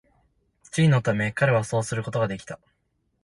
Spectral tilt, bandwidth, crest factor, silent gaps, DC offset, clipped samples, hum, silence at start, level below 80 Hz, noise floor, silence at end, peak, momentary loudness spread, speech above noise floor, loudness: -6 dB/octave; 11.5 kHz; 16 dB; none; under 0.1%; under 0.1%; none; 0.75 s; -56 dBFS; -72 dBFS; 0.7 s; -10 dBFS; 15 LU; 49 dB; -24 LUFS